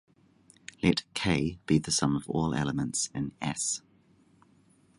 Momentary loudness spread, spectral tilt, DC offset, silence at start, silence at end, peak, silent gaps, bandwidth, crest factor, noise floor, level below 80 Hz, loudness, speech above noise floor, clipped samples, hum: 7 LU; -4 dB/octave; under 0.1%; 0.8 s; 1.2 s; -10 dBFS; none; 11.5 kHz; 22 dB; -63 dBFS; -52 dBFS; -29 LUFS; 34 dB; under 0.1%; none